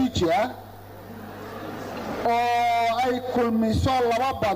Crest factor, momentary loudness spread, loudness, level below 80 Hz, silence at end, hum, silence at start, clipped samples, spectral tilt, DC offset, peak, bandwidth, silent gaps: 10 dB; 18 LU; -23 LUFS; -46 dBFS; 0 s; none; 0 s; under 0.1%; -5.5 dB/octave; under 0.1%; -14 dBFS; 16 kHz; none